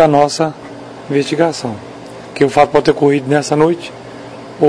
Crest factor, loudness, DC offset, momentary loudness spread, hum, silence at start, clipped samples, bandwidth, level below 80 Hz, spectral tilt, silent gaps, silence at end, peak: 14 dB; -14 LUFS; under 0.1%; 20 LU; none; 0 s; 0.2%; 11 kHz; -50 dBFS; -5.5 dB/octave; none; 0 s; 0 dBFS